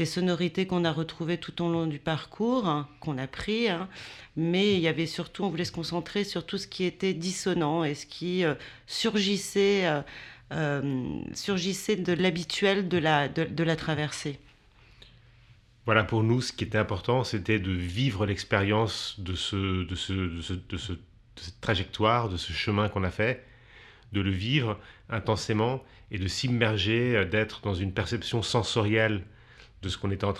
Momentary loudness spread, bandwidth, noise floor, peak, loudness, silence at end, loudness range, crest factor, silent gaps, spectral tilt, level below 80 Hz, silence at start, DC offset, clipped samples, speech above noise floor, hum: 10 LU; 13.5 kHz; -57 dBFS; -6 dBFS; -28 LUFS; 0 s; 3 LU; 22 dB; none; -5.5 dB/octave; -54 dBFS; 0 s; under 0.1%; under 0.1%; 29 dB; none